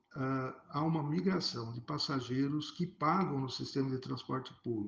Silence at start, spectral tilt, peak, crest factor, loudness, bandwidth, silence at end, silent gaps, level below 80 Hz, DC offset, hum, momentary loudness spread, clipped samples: 0.15 s; -6.5 dB/octave; -18 dBFS; 18 dB; -36 LUFS; 7.6 kHz; 0 s; none; -72 dBFS; under 0.1%; none; 8 LU; under 0.1%